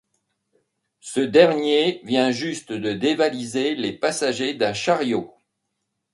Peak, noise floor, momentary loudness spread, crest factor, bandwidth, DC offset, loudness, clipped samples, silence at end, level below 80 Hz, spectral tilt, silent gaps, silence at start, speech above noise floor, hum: -2 dBFS; -77 dBFS; 11 LU; 22 dB; 11.5 kHz; under 0.1%; -21 LUFS; under 0.1%; 0.85 s; -64 dBFS; -4 dB/octave; none; 1.05 s; 56 dB; none